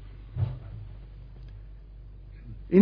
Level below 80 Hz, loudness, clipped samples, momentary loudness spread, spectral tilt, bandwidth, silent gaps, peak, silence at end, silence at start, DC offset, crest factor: -44 dBFS; -33 LUFS; under 0.1%; 16 LU; -12 dB/octave; 5.2 kHz; none; -8 dBFS; 0 s; 0 s; under 0.1%; 22 dB